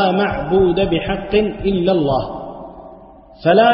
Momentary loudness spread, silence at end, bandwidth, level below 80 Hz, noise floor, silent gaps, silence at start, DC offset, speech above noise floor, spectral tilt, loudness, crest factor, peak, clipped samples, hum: 16 LU; 0 s; 5.6 kHz; -36 dBFS; -40 dBFS; none; 0 s; under 0.1%; 25 dB; -11.5 dB/octave; -17 LUFS; 16 dB; -2 dBFS; under 0.1%; none